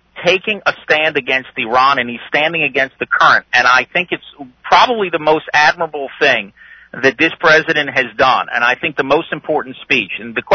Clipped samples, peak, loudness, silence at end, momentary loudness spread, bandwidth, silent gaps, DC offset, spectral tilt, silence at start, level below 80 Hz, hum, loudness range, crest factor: under 0.1%; 0 dBFS; -13 LUFS; 0 s; 10 LU; 6.6 kHz; none; under 0.1%; -3.5 dB/octave; 0.15 s; -54 dBFS; none; 2 LU; 14 dB